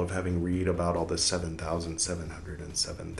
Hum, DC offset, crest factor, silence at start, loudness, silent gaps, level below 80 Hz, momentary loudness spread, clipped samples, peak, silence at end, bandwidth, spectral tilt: none; under 0.1%; 18 dB; 0 s; -30 LUFS; none; -48 dBFS; 8 LU; under 0.1%; -14 dBFS; 0 s; 12.5 kHz; -4 dB/octave